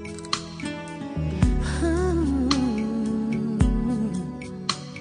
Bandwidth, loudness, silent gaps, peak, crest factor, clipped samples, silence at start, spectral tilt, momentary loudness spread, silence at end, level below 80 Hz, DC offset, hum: 10 kHz; -26 LUFS; none; -4 dBFS; 20 dB; under 0.1%; 0 s; -6 dB/octave; 10 LU; 0 s; -32 dBFS; under 0.1%; none